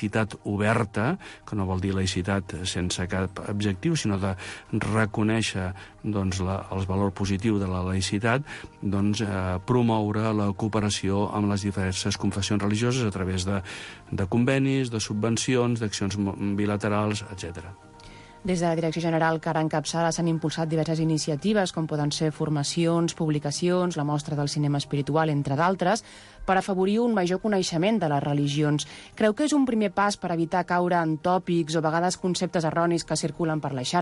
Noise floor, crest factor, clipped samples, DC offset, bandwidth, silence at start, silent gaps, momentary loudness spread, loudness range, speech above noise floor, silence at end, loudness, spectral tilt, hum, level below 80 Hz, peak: -47 dBFS; 14 dB; under 0.1%; under 0.1%; 11.5 kHz; 0 s; none; 6 LU; 3 LU; 21 dB; 0 s; -26 LUFS; -5.5 dB/octave; none; -46 dBFS; -10 dBFS